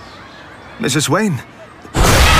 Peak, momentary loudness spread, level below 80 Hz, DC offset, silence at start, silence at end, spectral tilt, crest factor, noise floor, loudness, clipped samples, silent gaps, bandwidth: 0 dBFS; 23 LU; -22 dBFS; under 0.1%; 0 s; 0 s; -4 dB/octave; 16 dB; -36 dBFS; -16 LUFS; under 0.1%; none; 16 kHz